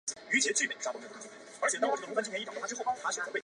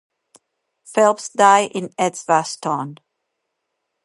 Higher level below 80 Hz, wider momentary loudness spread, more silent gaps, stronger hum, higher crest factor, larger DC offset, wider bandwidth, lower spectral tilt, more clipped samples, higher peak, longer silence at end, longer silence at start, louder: second, -84 dBFS vs -78 dBFS; first, 15 LU vs 11 LU; neither; neither; about the same, 20 dB vs 20 dB; neither; about the same, 11.5 kHz vs 11.5 kHz; second, -0.5 dB/octave vs -3.5 dB/octave; neither; second, -14 dBFS vs 0 dBFS; second, 0.05 s vs 1.1 s; second, 0.05 s vs 0.9 s; second, -32 LUFS vs -18 LUFS